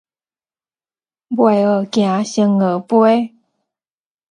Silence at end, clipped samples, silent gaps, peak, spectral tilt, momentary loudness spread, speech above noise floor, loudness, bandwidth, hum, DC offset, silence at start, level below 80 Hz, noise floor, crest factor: 1.05 s; under 0.1%; none; -2 dBFS; -6.5 dB/octave; 5 LU; over 76 dB; -15 LUFS; 9.8 kHz; none; under 0.1%; 1.3 s; -66 dBFS; under -90 dBFS; 16 dB